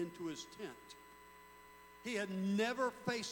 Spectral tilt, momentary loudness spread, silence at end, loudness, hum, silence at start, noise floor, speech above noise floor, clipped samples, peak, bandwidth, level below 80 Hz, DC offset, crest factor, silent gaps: -4.5 dB/octave; 22 LU; 0 s; -40 LUFS; 60 Hz at -75 dBFS; 0 s; -60 dBFS; 19 dB; under 0.1%; -22 dBFS; 18 kHz; -76 dBFS; under 0.1%; 20 dB; none